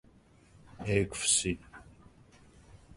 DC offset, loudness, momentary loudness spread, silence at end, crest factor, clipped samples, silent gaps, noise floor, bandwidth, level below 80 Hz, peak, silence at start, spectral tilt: under 0.1%; -30 LUFS; 14 LU; 0 s; 24 dB; under 0.1%; none; -61 dBFS; 11.5 kHz; -54 dBFS; -12 dBFS; 0.75 s; -3 dB/octave